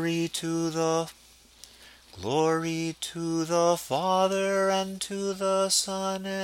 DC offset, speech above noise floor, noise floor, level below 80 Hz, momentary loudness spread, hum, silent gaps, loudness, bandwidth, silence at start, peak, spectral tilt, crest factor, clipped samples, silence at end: under 0.1%; 26 dB; -53 dBFS; -64 dBFS; 7 LU; none; none; -27 LUFS; 17 kHz; 0 s; -10 dBFS; -4 dB/octave; 18 dB; under 0.1%; 0 s